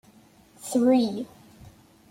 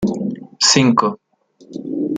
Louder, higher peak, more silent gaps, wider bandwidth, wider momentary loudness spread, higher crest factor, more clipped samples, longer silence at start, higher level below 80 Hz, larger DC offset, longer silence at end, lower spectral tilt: second, -24 LUFS vs -16 LUFS; second, -10 dBFS vs 0 dBFS; neither; first, 16 kHz vs 9.6 kHz; about the same, 20 LU vs 21 LU; about the same, 16 dB vs 18 dB; neither; first, 0.6 s vs 0 s; second, -64 dBFS vs -54 dBFS; neither; first, 0.85 s vs 0 s; first, -5 dB/octave vs -3.5 dB/octave